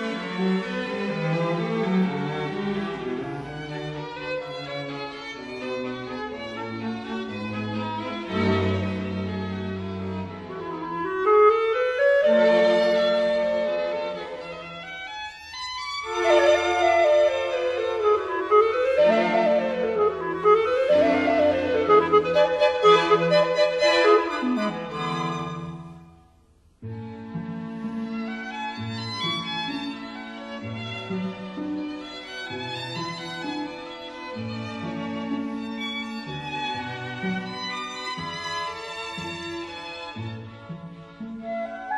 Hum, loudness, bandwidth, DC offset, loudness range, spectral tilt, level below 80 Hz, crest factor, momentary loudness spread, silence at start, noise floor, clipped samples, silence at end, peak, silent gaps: none; -24 LUFS; 10.5 kHz; under 0.1%; 12 LU; -5.5 dB/octave; -58 dBFS; 20 dB; 16 LU; 0 s; -58 dBFS; under 0.1%; 0 s; -6 dBFS; none